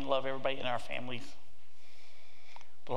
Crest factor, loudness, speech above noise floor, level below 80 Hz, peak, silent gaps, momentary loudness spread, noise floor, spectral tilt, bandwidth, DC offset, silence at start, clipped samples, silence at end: 22 dB; -37 LUFS; 28 dB; -70 dBFS; -16 dBFS; none; 25 LU; -64 dBFS; -5 dB/octave; 15.5 kHz; 3%; 0 s; under 0.1%; 0 s